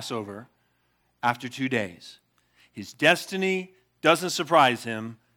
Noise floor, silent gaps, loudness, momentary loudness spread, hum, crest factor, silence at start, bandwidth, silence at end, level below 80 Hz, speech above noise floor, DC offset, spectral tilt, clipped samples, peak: -70 dBFS; none; -24 LUFS; 22 LU; 60 Hz at -60 dBFS; 24 dB; 0 s; 19 kHz; 0.25 s; -76 dBFS; 45 dB; under 0.1%; -4 dB/octave; under 0.1%; -4 dBFS